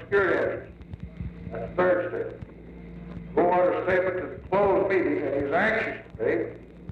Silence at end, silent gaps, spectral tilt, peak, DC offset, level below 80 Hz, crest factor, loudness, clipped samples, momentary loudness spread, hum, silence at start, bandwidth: 0 s; none; -8 dB/octave; -12 dBFS; under 0.1%; -48 dBFS; 16 dB; -26 LUFS; under 0.1%; 20 LU; none; 0 s; 6.8 kHz